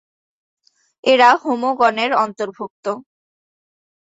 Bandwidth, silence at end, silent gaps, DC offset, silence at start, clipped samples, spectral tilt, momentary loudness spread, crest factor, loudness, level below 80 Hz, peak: 8 kHz; 1.15 s; 2.70-2.83 s; under 0.1%; 1.05 s; under 0.1%; -3.5 dB/octave; 15 LU; 18 dB; -17 LUFS; -70 dBFS; -2 dBFS